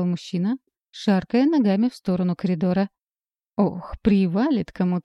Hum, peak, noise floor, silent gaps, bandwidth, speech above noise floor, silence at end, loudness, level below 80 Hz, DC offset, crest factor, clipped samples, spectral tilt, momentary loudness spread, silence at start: none; -6 dBFS; under -90 dBFS; none; 8 kHz; over 69 dB; 0.05 s; -23 LUFS; -48 dBFS; under 0.1%; 16 dB; under 0.1%; -8 dB/octave; 7 LU; 0 s